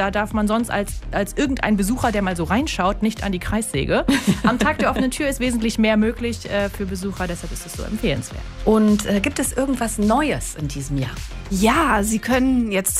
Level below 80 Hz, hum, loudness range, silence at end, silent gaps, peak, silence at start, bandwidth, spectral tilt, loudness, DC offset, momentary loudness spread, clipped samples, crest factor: -32 dBFS; none; 2 LU; 0 s; none; -2 dBFS; 0 s; 16 kHz; -4.5 dB/octave; -21 LUFS; under 0.1%; 9 LU; under 0.1%; 18 dB